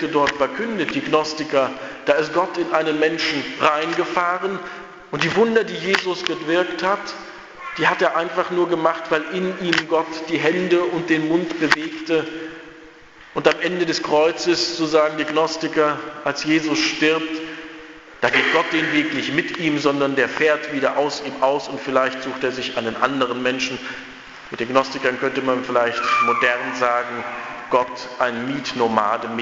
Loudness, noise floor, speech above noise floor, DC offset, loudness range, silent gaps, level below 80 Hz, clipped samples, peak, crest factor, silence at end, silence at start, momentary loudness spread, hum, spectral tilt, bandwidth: -20 LUFS; -44 dBFS; 24 dB; under 0.1%; 2 LU; none; -58 dBFS; under 0.1%; 0 dBFS; 20 dB; 0 s; 0 s; 10 LU; none; -4 dB/octave; 8 kHz